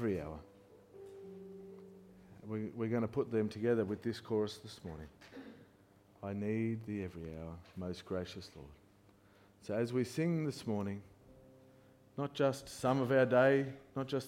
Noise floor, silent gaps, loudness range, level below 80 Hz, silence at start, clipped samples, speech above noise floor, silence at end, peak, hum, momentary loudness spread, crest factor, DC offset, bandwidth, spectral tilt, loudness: -65 dBFS; none; 9 LU; -66 dBFS; 0 s; under 0.1%; 29 dB; 0 s; -16 dBFS; none; 22 LU; 22 dB; under 0.1%; 16.5 kHz; -6.5 dB/octave; -36 LUFS